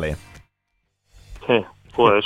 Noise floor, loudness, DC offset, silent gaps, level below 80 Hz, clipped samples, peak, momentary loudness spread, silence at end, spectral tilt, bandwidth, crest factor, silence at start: -73 dBFS; -22 LUFS; under 0.1%; none; -44 dBFS; under 0.1%; -2 dBFS; 16 LU; 0 s; -6.5 dB/octave; 11.5 kHz; 20 dB; 0 s